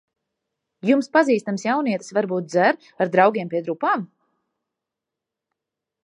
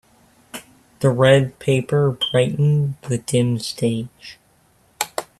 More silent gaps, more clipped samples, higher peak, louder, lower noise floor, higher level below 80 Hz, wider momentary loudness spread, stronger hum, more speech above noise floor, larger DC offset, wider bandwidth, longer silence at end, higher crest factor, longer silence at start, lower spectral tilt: neither; neither; about the same, -2 dBFS vs -2 dBFS; about the same, -21 LUFS vs -19 LUFS; first, -85 dBFS vs -58 dBFS; second, -78 dBFS vs -56 dBFS; second, 8 LU vs 22 LU; neither; first, 65 dB vs 39 dB; neither; second, 10.5 kHz vs 14 kHz; first, 2 s vs 0.15 s; about the same, 20 dB vs 20 dB; first, 0.85 s vs 0.55 s; about the same, -6 dB/octave vs -6 dB/octave